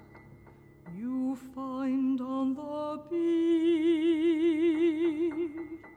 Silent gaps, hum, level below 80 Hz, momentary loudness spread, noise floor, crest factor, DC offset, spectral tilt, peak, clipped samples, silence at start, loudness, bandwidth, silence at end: none; none; -68 dBFS; 11 LU; -55 dBFS; 10 dB; under 0.1%; -6.5 dB/octave; -18 dBFS; under 0.1%; 0 s; -29 LUFS; 8.8 kHz; 0 s